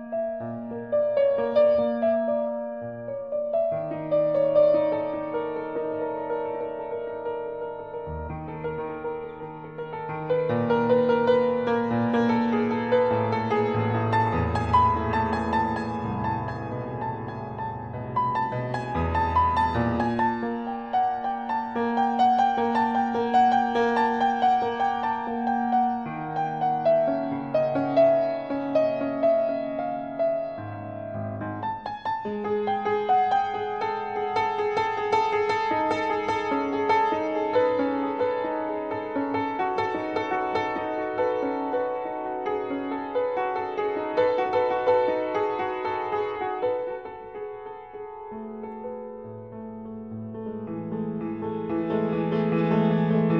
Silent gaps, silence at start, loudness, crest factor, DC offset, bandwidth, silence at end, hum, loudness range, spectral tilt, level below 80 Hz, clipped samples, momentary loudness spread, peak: none; 0 s; -26 LUFS; 16 dB; under 0.1%; 8.4 kHz; 0 s; none; 8 LU; -7.5 dB/octave; -50 dBFS; under 0.1%; 13 LU; -10 dBFS